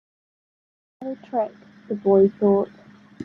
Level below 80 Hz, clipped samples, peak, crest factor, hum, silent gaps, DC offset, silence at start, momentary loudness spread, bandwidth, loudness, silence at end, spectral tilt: -68 dBFS; under 0.1%; -6 dBFS; 18 dB; none; none; under 0.1%; 1 s; 17 LU; 3.8 kHz; -22 LUFS; 0 s; -10.5 dB/octave